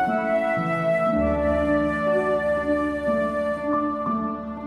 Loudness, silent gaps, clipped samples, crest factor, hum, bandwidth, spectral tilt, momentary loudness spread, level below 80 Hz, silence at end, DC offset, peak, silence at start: -23 LUFS; none; under 0.1%; 12 dB; none; 11 kHz; -8 dB/octave; 4 LU; -42 dBFS; 0 s; under 0.1%; -10 dBFS; 0 s